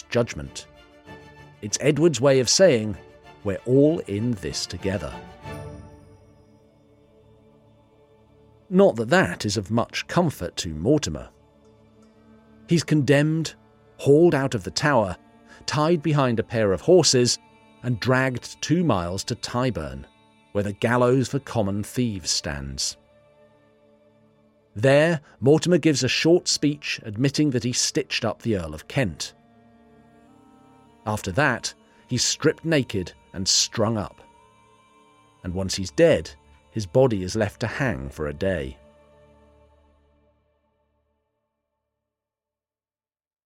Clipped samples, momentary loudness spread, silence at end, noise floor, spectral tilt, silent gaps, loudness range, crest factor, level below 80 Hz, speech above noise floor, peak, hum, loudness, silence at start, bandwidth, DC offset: under 0.1%; 15 LU; 4.7 s; under -90 dBFS; -4.5 dB/octave; none; 8 LU; 18 dB; -52 dBFS; over 68 dB; -6 dBFS; none; -22 LUFS; 0.1 s; 16 kHz; under 0.1%